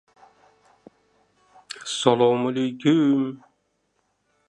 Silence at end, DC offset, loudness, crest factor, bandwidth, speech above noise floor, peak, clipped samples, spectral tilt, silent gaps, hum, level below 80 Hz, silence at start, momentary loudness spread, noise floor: 1.1 s; under 0.1%; -21 LUFS; 22 dB; 11.5 kHz; 51 dB; -2 dBFS; under 0.1%; -5.5 dB/octave; none; none; -74 dBFS; 1.75 s; 17 LU; -71 dBFS